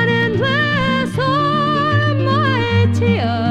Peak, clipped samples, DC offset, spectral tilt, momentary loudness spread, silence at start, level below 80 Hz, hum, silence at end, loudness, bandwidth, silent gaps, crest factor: -4 dBFS; under 0.1%; under 0.1%; -7 dB/octave; 2 LU; 0 s; -44 dBFS; none; 0 s; -16 LUFS; 10.5 kHz; none; 12 dB